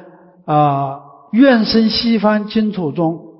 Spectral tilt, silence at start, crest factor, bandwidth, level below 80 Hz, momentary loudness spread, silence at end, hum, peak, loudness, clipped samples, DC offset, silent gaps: -9.5 dB/octave; 0 s; 14 dB; 5.8 kHz; -48 dBFS; 11 LU; 0.1 s; none; -2 dBFS; -15 LUFS; under 0.1%; under 0.1%; none